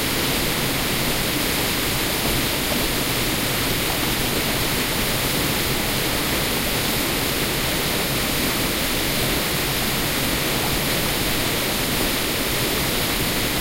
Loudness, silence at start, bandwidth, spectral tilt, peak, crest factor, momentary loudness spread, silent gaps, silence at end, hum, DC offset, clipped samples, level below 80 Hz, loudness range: -20 LUFS; 0 s; 16 kHz; -3 dB/octave; -8 dBFS; 14 dB; 1 LU; none; 0 s; none; under 0.1%; under 0.1%; -34 dBFS; 0 LU